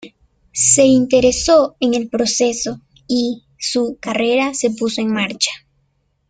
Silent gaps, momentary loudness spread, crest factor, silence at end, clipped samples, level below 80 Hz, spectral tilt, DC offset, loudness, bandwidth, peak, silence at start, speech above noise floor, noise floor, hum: none; 12 LU; 16 dB; 0.75 s; under 0.1%; -46 dBFS; -2.5 dB/octave; under 0.1%; -16 LUFS; 9.6 kHz; 0 dBFS; 0 s; 48 dB; -64 dBFS; none